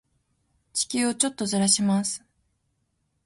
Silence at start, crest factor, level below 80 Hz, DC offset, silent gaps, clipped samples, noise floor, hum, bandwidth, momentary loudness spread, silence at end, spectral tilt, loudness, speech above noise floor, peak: 0.75 s; 22 dB; -66 dBFS; under 0.1%; none; under 0.1%; -74 dBFS; none; 11.5 kHz; 11 LU; 1.1 s; -3 dB/octave; -24 LUFS; 49 dB; -6 dBFS